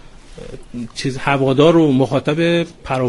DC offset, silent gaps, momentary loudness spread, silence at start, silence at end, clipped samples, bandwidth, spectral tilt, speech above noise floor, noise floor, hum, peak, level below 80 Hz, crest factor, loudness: under 0.1%; none; 20 LU; 0.05 s; 0 s; under 0.1%; 11.5 kHz; -6.5 dB/octave; 20 dB; -35 dBFS; none; 0 dBFS; -42 dBFS; 16 dB; -15 LUFS